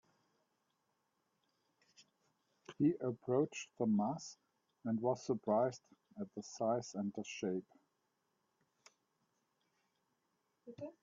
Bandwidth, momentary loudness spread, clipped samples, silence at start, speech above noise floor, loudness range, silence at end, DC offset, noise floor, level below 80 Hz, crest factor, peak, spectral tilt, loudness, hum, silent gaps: 7.4 kHz; 16 LU; under 0.1%; 2 s; 45 dB; 10 LU; 0.1 s; under 0.1%; -84 dBFS; -84 dBFS; 20 dB; -22 dBFS; -7 dB/octave; -39 LUFS; none; none